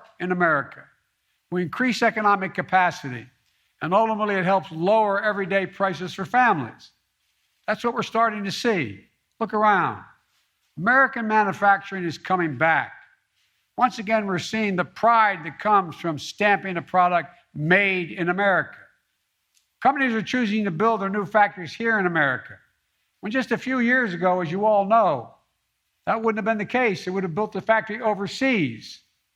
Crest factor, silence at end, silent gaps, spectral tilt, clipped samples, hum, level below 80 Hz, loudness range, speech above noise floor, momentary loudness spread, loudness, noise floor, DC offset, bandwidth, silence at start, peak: 20 dB; 0.4 s; none; -5.5 dB/octave; under 0.1%; none; -68 dBFS; 3 LU; 52 dB; 10 LU; -22 LUFS; -74 dBFS; under 0.1%; 13.5 kHz; 0.2 s; -4 dBFS